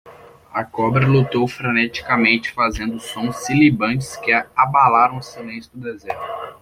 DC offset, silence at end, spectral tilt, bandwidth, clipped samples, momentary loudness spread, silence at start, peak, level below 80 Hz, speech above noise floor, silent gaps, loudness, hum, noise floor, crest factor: under 0.1%; 0.1 s; -6 dB/octave; 15.5 kHz; under 0.1%; 17 LU; 0.05 s; -2 dBFS; -46 dBFS; 20 dB; none; -18 LUFS; none; -39 dBFS; 16 dB